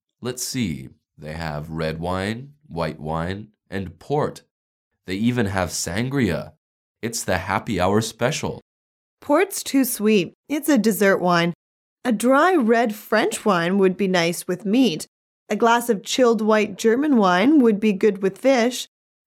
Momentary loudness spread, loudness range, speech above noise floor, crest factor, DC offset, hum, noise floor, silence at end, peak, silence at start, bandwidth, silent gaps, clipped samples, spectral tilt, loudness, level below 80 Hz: 14 LU; 9 LU; over 70 dB; 16 dB; under 0.1%; none; under -90 dBFS; 0.4 s; -6 dBFS; 0.2 s; 17 kHz; 4.51-4.91 s, 6.57-6.95 s, 8.62-9.17 s, 10.35-10.43 s, 11.55-11.97 s, 15.08-15.46 s; under 0.1%; -5 dB/octave; -21 LUFS; -52 dBFS